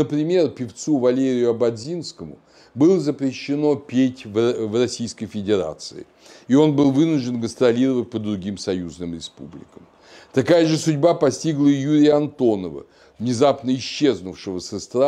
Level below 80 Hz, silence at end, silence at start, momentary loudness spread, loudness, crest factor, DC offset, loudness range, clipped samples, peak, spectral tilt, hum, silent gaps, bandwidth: -60 dBFS; 0 s; 0 s; 14 LU; -20 LUFS; 16 dB; under 0.1%; 4 LU; under 0.1%; -4 dBFS; -6 dB/octave; none; none; 10.5 kHz